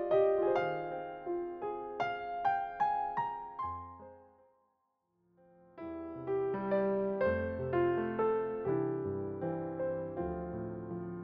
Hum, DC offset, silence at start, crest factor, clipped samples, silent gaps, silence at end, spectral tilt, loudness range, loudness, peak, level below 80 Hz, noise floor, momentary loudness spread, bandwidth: none; under 0.1%; 0 s; 16 dB; under 0.1%; none; 0 s; -6.5 dB/octave; 8 LU; -35 LUFS; -18 dBFS; -62 dBFS; -79 dBFS; 10 LU; 6.2 kHz